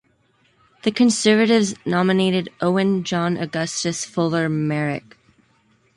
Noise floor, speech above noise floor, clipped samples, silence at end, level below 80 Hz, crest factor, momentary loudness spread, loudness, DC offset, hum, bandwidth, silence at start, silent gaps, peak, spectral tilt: -61 dBFS; 42 dB; under 0.1%; 0.95 s; -62 dBFS; 16 dB; 8 LU; -20 LUFS; under 0.1%; none; 11.5 kHz; 0.85 s; none; -4 dBFS; -5 dB/octave